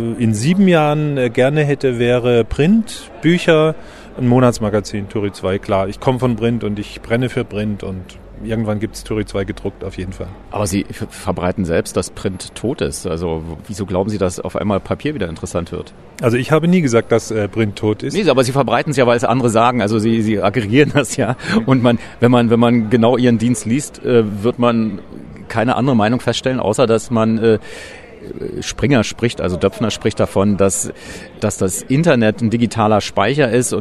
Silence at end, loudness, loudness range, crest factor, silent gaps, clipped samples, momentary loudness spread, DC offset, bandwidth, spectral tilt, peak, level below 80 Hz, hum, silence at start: 0 s; -16 LUFS; 7 LU; 16 dB; none; under 0.1%; 13 LU; under 0.1%; 13 kHz; -6 dB/octave; 0 dBFS; -40 dBFS; none; 0 s